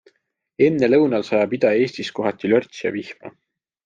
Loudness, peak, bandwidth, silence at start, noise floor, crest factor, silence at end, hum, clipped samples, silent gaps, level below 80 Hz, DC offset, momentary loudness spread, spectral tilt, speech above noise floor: -19 LUFS; -4 dBFS; 7.6 kHz; 0.6 s; -61 dBFS; 16 dB; 0.55 s; none; under 0.1%; none; -62 dBFS; under 0.1%; 11 LU; -6.5 dB/octave; 42 dB